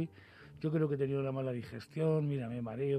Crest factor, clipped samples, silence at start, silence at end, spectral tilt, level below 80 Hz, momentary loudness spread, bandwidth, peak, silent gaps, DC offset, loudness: 14 dB; under 0.1%; 0 s; 0 s; -9.5 dB/octave; -70 dBFS; 10 LU; 9.2 kHz; -20 dBFS; none; under 0.1%; -36 LUFS